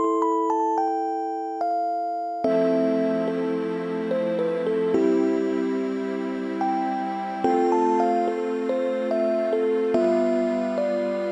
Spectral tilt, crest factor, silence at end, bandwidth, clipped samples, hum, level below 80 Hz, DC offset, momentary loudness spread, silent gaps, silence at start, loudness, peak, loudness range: -7 dB/octave; 14 dB; 0 s; 10.5 kHz; under 0.1%; none; -72 dBFS; under 0.1%; 6 LU; none; 0 s; -24 LUFS; -8 dBFS; 2 LU